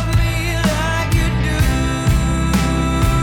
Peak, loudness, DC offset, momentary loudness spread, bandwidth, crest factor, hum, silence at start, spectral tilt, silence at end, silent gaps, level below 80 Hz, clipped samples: -2 dBFS; -17 LUFS; under 0.1%; 1 LU; 19 kHz; 14 dB; none; 0 s; -5.5 dB/octave; 0 s; none; -20 dBFS; under 0.1%